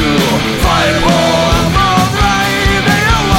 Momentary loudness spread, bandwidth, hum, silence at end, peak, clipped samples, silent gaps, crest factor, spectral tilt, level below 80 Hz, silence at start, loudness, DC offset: 1 LU; 17 kHz; none; 0 s; 0 dBFS; under 0.1%; none; 10 dB; -4.5 dB/octave; -20 dBFS; 0 s; -11 LUFS; 0.2%